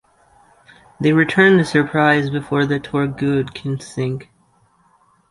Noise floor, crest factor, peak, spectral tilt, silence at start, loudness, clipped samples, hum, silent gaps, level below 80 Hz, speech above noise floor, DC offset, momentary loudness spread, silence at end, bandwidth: -58 dBFS; 18 dB; -2 dBFS; -6.5 dB/octave; 1 s; -17 LUFS; under 0.1%; none; none; -54 dBFS; 41 dB; under 0.1%; 12 LU; 1.1 s; 11.5 kHz